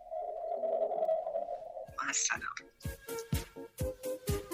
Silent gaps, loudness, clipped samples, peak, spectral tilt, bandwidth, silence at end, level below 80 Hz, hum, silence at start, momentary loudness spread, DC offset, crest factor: none; -36 LUFS; under 0.1%; -18 dBFS; -3.5 dB/octave; 16 kHz; 0 s; -50 dBFS; none; 0 s; 12 LU; under 0.1%; 18 dB